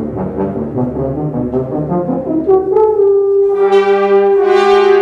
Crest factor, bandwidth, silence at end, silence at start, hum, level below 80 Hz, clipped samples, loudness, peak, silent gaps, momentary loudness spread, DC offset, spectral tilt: 10 dB; 7.2 kHz; 0 s; 0 s; none; -40 dBFS; under 0.1%; -12 LUFS; 0 dBFS; none; 9 LU; under 0.1%; -7.5 dB/octave